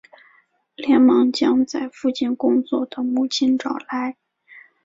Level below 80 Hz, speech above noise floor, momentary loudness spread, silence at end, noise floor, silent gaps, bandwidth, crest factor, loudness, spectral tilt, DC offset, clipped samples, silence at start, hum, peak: -64 dBFS; 40 dB; 11 LU; 0.25 s; -59 dBFS; none; 7.8 kHz; 14 dB; -20 LUFS; -4 dB/octave; under 0.1%; under 0.1%; 0.8 s; none; -6 dBFS